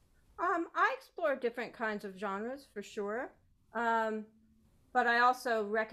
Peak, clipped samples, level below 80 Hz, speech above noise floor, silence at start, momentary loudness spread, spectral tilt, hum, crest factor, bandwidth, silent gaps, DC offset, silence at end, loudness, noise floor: -16 dBFS; under 0.1%; -72 dBFS; 33 dB; 0.4 s; 14 LU; -4 dB/octave; none; 18 dB; 14.5 kHz; none; under 0.1%; 0 s; -34 LUFS; -67 dBFS